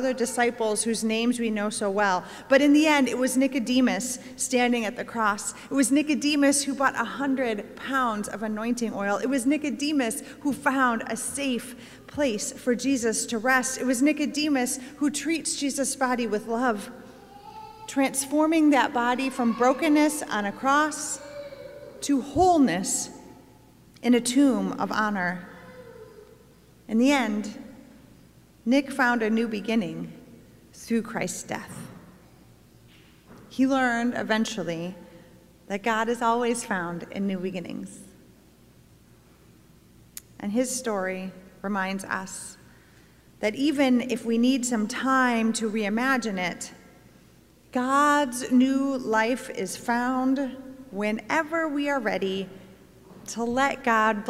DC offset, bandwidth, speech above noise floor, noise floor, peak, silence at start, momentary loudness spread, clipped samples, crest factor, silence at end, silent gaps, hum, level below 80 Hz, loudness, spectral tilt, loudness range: under 0.1%; 16 kHz; 30 dB; -55 dBFS; -8 dBFS; 0 s; 16 LU; under 0.1%; 18 dB; 0 s; none; none; -60 dBFS; -25 LUFS; -3.5 dB/octave; 8 LU